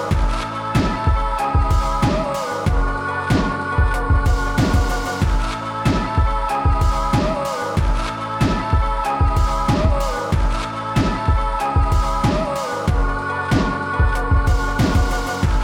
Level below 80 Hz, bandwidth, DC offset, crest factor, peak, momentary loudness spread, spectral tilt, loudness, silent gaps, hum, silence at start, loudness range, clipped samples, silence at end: -22 dBFS; 15 kHz; under 0.1%; 12 dB; -6 dBFS; 4 LU; -6 dB/octave; -20 LUFS; none; none; 0 s; 1 LU; under 0.1%; 0 s